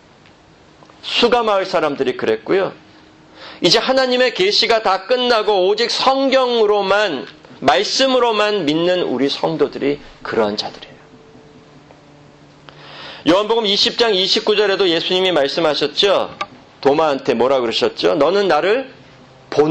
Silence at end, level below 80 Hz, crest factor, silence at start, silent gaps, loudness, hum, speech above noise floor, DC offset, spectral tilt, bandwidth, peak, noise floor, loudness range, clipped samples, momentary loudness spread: 0 s; -54 dBFS; 16 dB; 1.05 s; none; -16 LUFS; none; 31 dB; under 0.1%; -3.5 dB/octave; 9 kHz; 0 dBFS; -47 dBFS; 7 LU; under 0.1%; 8 LU